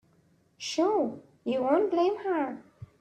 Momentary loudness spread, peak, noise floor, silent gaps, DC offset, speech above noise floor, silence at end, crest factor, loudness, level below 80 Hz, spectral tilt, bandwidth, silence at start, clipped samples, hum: 13 LU; -12 dBFS; -65 dBFS; none; under 0.1%; 38 dB; 0.15 s; 16 dB; -29 LUFS; -72 dBFS; -4.5 dB/octave; 9 kHz; 0.6 s; under 0.1%; none